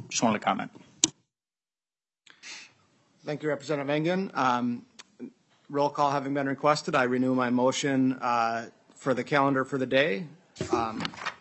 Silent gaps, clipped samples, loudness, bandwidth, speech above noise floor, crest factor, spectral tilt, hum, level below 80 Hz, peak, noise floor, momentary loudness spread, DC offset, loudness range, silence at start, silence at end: none; under 0.1%; -27 LUFS; 8.6 kHz; over 63 dB; 26 dB; -4 dB/octave; none; -72 dBFS; -2 dBFS; under -90 dBFS; 18 LU; under 0.1%; 7 LU; 0 s; 0.05 s